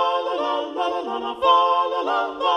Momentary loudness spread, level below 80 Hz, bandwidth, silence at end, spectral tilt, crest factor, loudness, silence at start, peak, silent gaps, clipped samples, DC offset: 8 LU; -62 dBFS; 9.2 kHz; 0 s; -3 dB/octave; 16 dB; -21 LUFS; 0 s; -4 dBFS; none; under 0.1%; under 0.1%